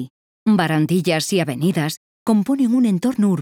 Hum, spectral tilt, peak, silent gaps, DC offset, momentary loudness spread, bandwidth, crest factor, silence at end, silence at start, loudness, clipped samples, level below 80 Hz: none; -6 dB/octave; -6 dBFS; 0.10-0.46 s, 1.97-2.26 s; under 0.1%; 8 LU; 17.5 kHz; 14 dB; 0 s; 0 s; -19 LUFS; under 0.1%; -62 dBFS